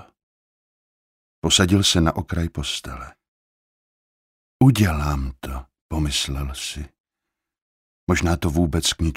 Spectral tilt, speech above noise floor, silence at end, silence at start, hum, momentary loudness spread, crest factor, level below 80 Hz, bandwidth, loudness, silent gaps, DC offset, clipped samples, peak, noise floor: -4.5 dB/octave; 63 dB; 0 s; 1.45 s; none; 19 LU; 20 dB; -34 dBFS; 16 kHz; -21 LUFS; 3.28-4.60 s, 5.81-5.89 s, 7.00-7.04 s, 7.62-8.07 s; under 0.1%; under 0.1%; -2 dBFS; -84 dBFS